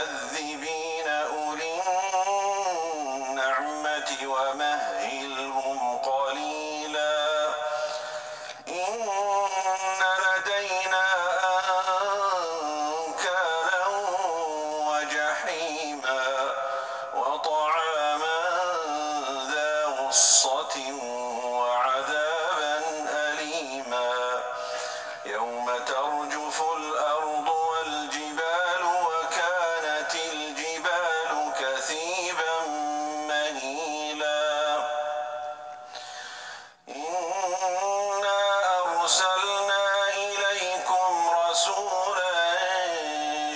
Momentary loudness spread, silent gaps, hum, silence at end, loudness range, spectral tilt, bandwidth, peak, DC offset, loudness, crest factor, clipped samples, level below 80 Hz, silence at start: 8 LU; none; none; 0 s; 5 LU; 0.5 dB/octave; 10 kHz; -6 dBFS; under 0.1%; -26 LUFS; 20 dB; under 0.1%; -78 dBFS; 0 s